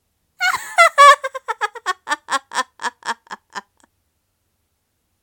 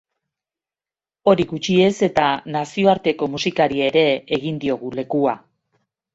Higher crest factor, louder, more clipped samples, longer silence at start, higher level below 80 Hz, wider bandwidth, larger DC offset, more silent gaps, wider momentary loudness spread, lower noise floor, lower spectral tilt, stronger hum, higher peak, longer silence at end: about the same, 20 dB vs 18 dB; first, -16 LUFS vs -19 LUFS; neither; second, 0.4 s vs 1.25 s; second, -68 dBFS vs -56 dBFS; first, 18 kHz vs 8 kHz; neither; neither; first, 23 LU vs 7 LU; second, -70 dBFS vs under -90 dBFS; second, 1 dB/octave vs -5.5 dB/octave; neither; about the same, 0 dBFS vs -2 dBFS; first, 1.6 s vs 0.75 s